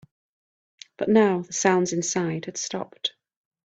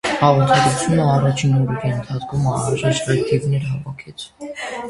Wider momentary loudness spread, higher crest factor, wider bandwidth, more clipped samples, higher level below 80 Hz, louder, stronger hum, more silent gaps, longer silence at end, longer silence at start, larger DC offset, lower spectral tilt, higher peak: second, 11 LU vs 16 LU; about the same, 22 dB vs 18 dB; second, 9 kHz vs 11.5 kHz; neither; second, -68 dBFS vs -44 dBFS; second, -24 LUFS vs -18 LUFS; neither; neither; first, 0.65 s vs 0 s; first, 1 s vs 0.05 s; neither; second, -4 dB/octave vs -5.5 dB/octave; second, -4 dBFS vs 0 dBFS